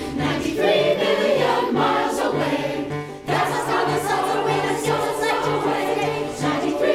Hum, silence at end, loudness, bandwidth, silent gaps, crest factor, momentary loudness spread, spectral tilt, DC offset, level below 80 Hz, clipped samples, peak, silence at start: none; 0 s; -21 LUFS; 16.5 kHz; none; 14 dB; 5 LU; -4.5 dB/octave; under 0.1%; -50 dBFS; under 0.1%; -6 dBFS; 0 s